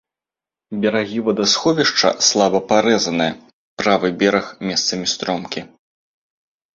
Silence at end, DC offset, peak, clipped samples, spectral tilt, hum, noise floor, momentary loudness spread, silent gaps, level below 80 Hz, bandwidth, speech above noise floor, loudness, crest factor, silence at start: 1.05 s; under 0.1%; -2 dBFS; under 0.1%; -3 dB/octave; none; -89 dBFS; 9 LU; 3.53-3.77 s; -58 dBFS; 7.8 kHz; 72 dB; -17 LUFS; 18 dB; 0.7 s